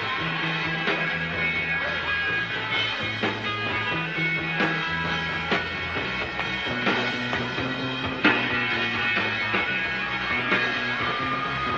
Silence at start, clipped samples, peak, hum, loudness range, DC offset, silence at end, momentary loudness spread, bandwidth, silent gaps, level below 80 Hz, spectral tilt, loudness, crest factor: 0 s; under 0.1%; -6 dBFS; none; 2 LU; under 0.1%; 0 s; 4 LU; 8 kHz; none; -50 dBFS; -5 dB/octave; -24 LUFS; 20 dB